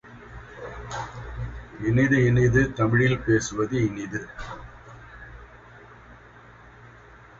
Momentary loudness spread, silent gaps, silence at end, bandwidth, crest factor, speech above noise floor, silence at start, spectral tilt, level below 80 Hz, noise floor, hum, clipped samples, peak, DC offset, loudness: 25 LU; none; 0.5 s; 7.8 kHz; 20 dB; 27 dB; 0.05 s; -6.5 dB/octave; -44 dBFS; -49 dBFS; none; under 0.1%; -6 dBFS; under 0.1%; -24 LUFS